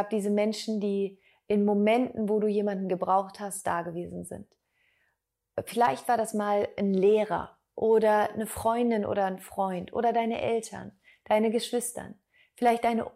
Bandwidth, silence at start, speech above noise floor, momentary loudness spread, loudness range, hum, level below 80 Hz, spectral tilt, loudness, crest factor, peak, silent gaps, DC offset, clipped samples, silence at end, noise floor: 16 kHz; 0 s; 52 dB; 14 LU; 5 LU; none; -64 dBFS; -5.5 dB/octave; -28 LUFS; 16 dB; -12 dBFS; none; under 0.1%; under 0.1%; 0.05 s; -79 dBFS